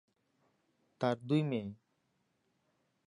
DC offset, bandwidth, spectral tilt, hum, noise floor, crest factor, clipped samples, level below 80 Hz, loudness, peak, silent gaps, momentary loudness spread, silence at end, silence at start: under 0.1%; 10.5 kHz; -8 dB/octave; none; -79 dBFS; 22 dB; under 0.1%; -78 dBFS; -35 LUFS; -18 dBFS; none; 8 LU; 1.35 s; 1 s